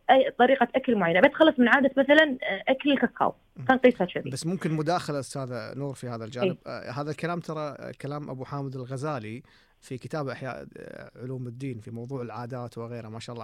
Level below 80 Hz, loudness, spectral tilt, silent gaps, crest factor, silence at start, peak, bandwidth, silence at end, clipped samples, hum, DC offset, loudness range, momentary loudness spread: -64 dBFS; -26 LUFS; -6 dB/octave; none; 22 dB; 0.1 s; -4 dBFS; 13 kHz; 0 s; under 0.1%; none; under 0.1%; 14 LU; 18 LU